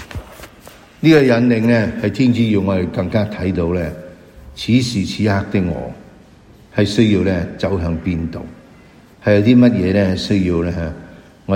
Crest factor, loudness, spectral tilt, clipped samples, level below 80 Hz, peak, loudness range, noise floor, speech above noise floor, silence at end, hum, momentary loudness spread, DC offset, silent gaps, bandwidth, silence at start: 16 dB; -16 LUFS; -7 dB/octave; under 0.1%; -38 dBFS; 0 dBFS; 4 LU; -44 dBFS; 29 dB; 0 s; none; 20 LU; under 0.1%; none; 14.5 kHz; 0 s